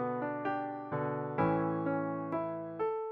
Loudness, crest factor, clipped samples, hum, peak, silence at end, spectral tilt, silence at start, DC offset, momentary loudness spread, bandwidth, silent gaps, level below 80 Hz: -35 LUFS; 18 dB; under 0.1%; none; -16 dBFS; 0 s; -7.5 dB/octave; 0 s; under 0.1%; 6 LU; 5.4 kHz; none; -68 dBFS